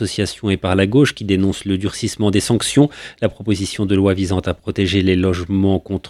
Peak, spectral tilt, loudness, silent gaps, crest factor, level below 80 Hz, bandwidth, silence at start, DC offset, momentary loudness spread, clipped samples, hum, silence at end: 0 dBFS; -5.5 dB/octave; -17 LUFS; none; 16 dB; -42 dBFS; 14 kHz; 0 s; under 0.1%; 6 LU; under 0.1%; none; 0 s